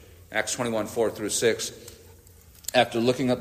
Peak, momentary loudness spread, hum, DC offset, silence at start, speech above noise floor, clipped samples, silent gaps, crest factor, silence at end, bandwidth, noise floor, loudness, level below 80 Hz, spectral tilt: -6 dBFS; 12 LU; none; under 0.1%; 0 s; 26 dB; under 0.1%; none; 22 dB; 0 s; 15.5 kHz; -52 dBFS; -26 LUFS; -58 dBFS; -3.5 dB/octave